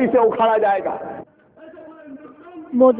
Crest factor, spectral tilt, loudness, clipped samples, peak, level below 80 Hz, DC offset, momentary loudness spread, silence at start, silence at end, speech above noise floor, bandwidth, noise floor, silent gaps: 18 dB; -9.5 dB/octave; -18 LUFS; under 0.1%; -2 dBFS; -62 dBFS; under 0.1%; 24 LU; 0 s; 0 s; 29 dB; 4 kHz; -45 dBFS; none